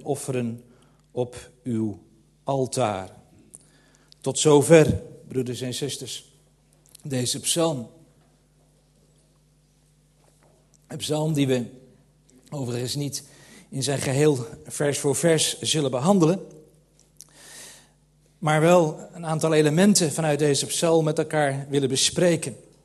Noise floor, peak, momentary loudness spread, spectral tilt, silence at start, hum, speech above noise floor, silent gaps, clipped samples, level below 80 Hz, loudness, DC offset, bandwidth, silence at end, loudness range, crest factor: -61 dBFS; -2 dBFS; 18 LU; -4.5 dB/octave; 0 s; none; 38 dB; none; under 0.1%; -58 dBFS; -23 LUFS; under 0.1%; 13 kHz; 0.25 s; 9 LU; 22 dB